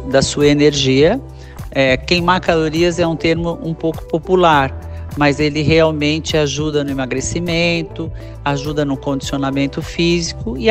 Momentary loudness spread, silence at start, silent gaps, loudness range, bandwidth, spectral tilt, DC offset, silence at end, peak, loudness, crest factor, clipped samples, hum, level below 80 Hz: 10 LU; 0 s; none; 4 LU; 15.5 kHz; -5 dB/octave; under 0.1%; 0 s; 0 dBFS; -16 LUFS; 16 dB; under 0.1%; none; -34 dBFS